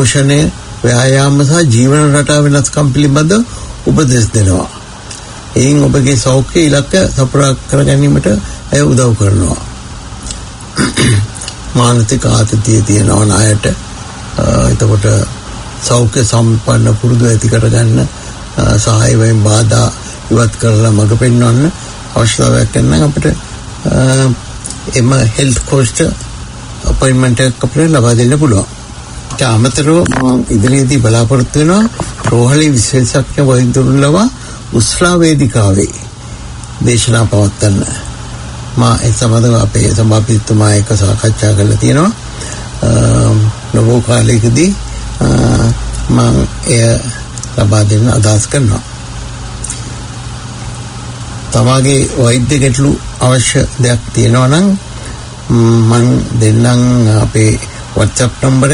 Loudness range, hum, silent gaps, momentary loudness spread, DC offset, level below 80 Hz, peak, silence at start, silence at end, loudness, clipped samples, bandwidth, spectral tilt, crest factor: 3 LU; none; none; 15 LU; under 0.1%; -26 dBFS; 0 dBFS; 0 s; 0 s; -10 LUFS; 0.2%; 11 kHz; -5.5 dB/octave; 10 dB